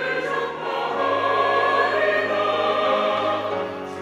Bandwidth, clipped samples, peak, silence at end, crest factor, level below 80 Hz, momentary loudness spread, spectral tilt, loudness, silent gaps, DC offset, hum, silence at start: 12.5 kHz; under 0.1%; -8 dBFS; 0 s; 14 dB; -66 dBFS; 7 LU; -4.5 dB/octave; -21 LUFS; none; under 0.1%; none; 0 s